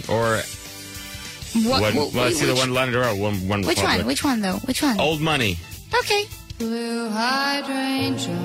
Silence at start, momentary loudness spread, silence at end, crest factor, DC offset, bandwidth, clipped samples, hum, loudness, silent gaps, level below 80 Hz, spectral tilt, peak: 0 s; 13 LU; 0 s; 16 dB; under 0.1%; 16 kHz; under 0.1%; none; -21 LUFS; none; -46 dBFS; -4 dB/octave; -6 dBFS